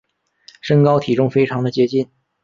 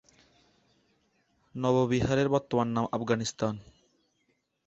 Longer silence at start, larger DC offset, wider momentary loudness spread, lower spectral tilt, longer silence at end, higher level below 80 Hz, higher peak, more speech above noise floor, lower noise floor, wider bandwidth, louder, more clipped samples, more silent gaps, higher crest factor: second, 0.65 s vs 1.55 s; neither; first, 11 LU vs 8 LU; first, -8 dB/octave vs -6 dB/octave; second, 0.4 s vs 1.05 s; about the same, -56 dBFS vs -56 dBFS; first, -2 dBFS vs -12 dBFS; second, 34 dB vs 47 dB; second, -50 dBFS vs -75 dBFS; second, 7.4 kHz vs 8.2 kHz; first, -17 LUFS vs -29 LUFS; neither; neither; about the same, 16 dB vs 20 dB